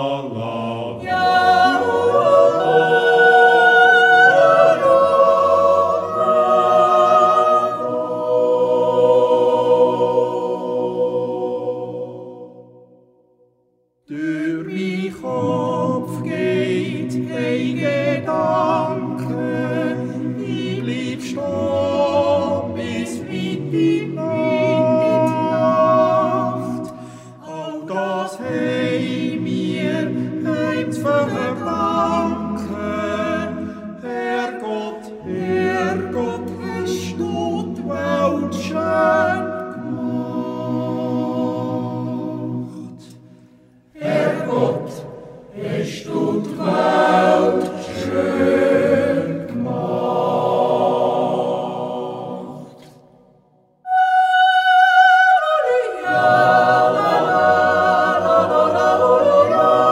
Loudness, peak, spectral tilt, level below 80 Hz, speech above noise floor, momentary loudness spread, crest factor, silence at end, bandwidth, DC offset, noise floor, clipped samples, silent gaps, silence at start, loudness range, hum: -17 LUFS; -2 dBFS; -6 dB/octave; -58 dBFS; 43 dB; 13 LU; 16 dB; 0 s; 15 kHz; under 0.1%; -63 dBFS; under 0.1%; none; 0 s; 11 LU; none